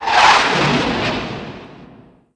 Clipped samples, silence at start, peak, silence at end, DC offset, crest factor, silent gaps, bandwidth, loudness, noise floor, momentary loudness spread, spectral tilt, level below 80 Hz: under 0.1%; 0 s; 0 dBFS; 0.5 s; under 0.1%; 16 dB; none; 10.5 kHz; -14 LUFS; -45 dBFS; 21 LU; -3.5 dB/octave; -42 dBFS